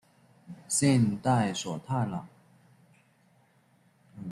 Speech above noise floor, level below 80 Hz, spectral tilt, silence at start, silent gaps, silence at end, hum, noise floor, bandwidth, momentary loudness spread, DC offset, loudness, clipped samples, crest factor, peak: 38 dB; -68 dBFS; -5 dB/octave; 0.5 s; none; 0 s; none; -65 dBFS; 13 kHz; 20 LU; under 0.1%; -28 LUFS; under 0.1%; 18 dB; -14 dBFS